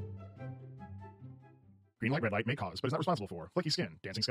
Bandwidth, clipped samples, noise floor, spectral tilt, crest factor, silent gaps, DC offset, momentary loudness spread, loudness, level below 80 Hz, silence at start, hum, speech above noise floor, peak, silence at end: 15.5 kHz; under 0.1%; -63 dBFS; -5.5 dB/octave; 20 dB; none; under 0.1%; 17 LU; -36 LUFS; -68 dBFS; 0 s; none; 28 dB; -16 dBFS; 0 s